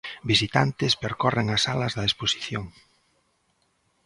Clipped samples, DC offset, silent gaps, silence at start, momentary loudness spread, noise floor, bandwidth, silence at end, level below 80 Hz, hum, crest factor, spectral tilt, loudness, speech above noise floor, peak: under 0.1%; under 0.1%; none; 0.05 s; 9 LU; -70 dBFS; 11.5 kHz; 1.35 s; -52 dBFS; none; 24 dB; -4 dB/octave; -24 LUFS; 45 dB; -4 dBFS